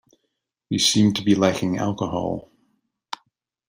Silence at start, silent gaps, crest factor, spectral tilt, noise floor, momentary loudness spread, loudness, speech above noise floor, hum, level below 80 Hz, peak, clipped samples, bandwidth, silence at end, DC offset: 0.7 s; none; 20 dB; -4.5 dB/octave; -77 dBFS; 20 LU; -21 LUFS; 57 dB; none; -58 dBFS; -4 dBFS; under 0.1%; 16 kHz; 0.55 s; under 0.1%